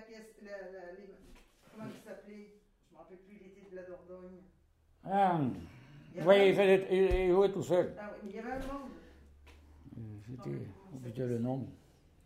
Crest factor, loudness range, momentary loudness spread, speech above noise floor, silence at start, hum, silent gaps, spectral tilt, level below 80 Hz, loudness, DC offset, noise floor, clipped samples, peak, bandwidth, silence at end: 24 dB; 23 LU; 24 LU; 33 dB; 0 s; none; none; -7 dB/octave; -52 dBFS; -31 LUFS; under 0.1%; -66 dBFS; under 0.1%; -12 dBFS; 14 kHz; 0.5 s